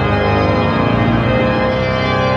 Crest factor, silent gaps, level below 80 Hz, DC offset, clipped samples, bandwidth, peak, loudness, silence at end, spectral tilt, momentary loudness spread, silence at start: 12 dB; none; -28 dBFS; under 0.1%; under 0.1%; 7.4 kHz; -2 dBFS; -14 LUFS; 0 s; -7.5 dB/octave; 1 LU; 0 s